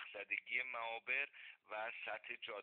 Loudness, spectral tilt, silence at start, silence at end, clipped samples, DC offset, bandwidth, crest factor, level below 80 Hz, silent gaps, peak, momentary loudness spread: -43 LUFS; 2.5 dB/octave; 0 s; 0 s; under 0.1%; under 0.1%; 4.6 kHz; 20 dB; under -90 dBFS; none; -26 dBFS; 8 LU